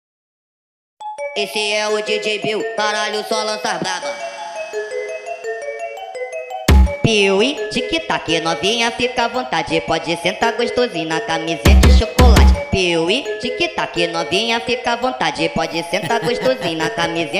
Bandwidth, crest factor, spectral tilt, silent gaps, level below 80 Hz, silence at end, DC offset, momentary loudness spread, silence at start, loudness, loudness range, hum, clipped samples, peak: 15 kHz; 18 dB; -4.5 dB/octave; none; -22 dBFS; 0 s; under 0.1%; 13 LU; 1 s; -17 LUFS; 7 LU; none; under 0.1%; 0 dBFS